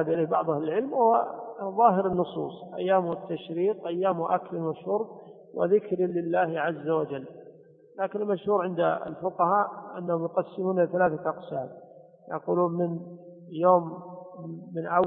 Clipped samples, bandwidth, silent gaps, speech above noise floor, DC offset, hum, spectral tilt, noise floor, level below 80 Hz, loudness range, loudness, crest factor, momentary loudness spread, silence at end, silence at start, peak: under 0.1%; 4 kHz; none; 25 dB; under 0.1%; none; -11 dB/octave; -52 dBFS; -70 dBFS; 3 LU; -27 LUFS; 20 dB; 15 LU; 0 s; 0 s; -8 dBFS